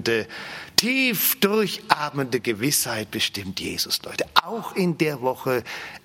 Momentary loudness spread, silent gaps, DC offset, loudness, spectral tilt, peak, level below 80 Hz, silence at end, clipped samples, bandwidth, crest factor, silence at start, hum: 8 LU; none; under 0.1%; -23 LUFS; -3 dB/octave; 0 dBFS; -62 dBFS; 0.05 s; under 0.1%; 16.5 kHz; 24 dB; 0 s; none